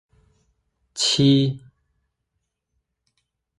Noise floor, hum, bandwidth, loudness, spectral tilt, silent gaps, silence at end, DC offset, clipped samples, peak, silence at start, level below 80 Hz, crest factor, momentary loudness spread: -78 dBFS; none; 11.5 kHz; -19 LUFS; -5 dB/octave; none; 2 s; under 0.1%; under 0.1%; -6 dBFS; 0.95 s; -60 dBFS; 20 dB; 21 LU